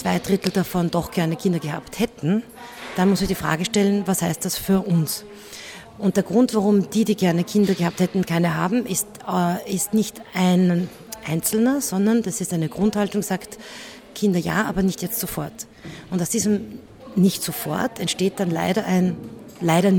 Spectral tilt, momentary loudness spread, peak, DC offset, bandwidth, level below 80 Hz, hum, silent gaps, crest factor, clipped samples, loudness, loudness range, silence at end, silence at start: -5.5 dB/octave; 14 LU; -2 dBFS; under 0.1%; 19.5 kHz; -50 dBFS; none; none; 20 dB; under 0.1%; -22 LUFS; 4 LU; 0 s; 0 s